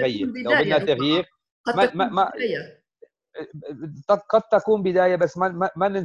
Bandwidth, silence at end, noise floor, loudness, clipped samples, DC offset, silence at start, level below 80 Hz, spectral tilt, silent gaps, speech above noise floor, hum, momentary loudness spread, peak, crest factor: 10.5 kHz; 0 s; -55 dBFS; -21 LUFS; under 0.1%; under 0.1%; 0 s; -62 dBFS; -6 dB/octave; 1.51-1.64 s; 33 dB; none; 17 LU; -6 dBFS; 18 dB